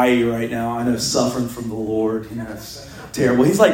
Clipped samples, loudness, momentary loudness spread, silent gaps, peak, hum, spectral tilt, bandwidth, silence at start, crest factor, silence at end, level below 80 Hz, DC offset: under 0.1%; -20 LUFS; 15 LU; none; 0 dBFS; none; -5 dB/octave; 16.5 kHz; 0 s; 18 dB; 0 s; -48 dBFS; under 0.1%